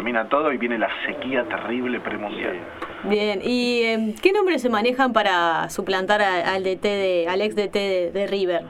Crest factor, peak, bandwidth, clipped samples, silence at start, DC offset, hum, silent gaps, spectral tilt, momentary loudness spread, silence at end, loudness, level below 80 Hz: 18 dB; -4 dBFS; 15.5 kHz; under 0.1%; 0 s; under 0.1%; none; none; -4.5 dB/octave; 8 LU; 0 s; -22 LUFS; -56 dBFS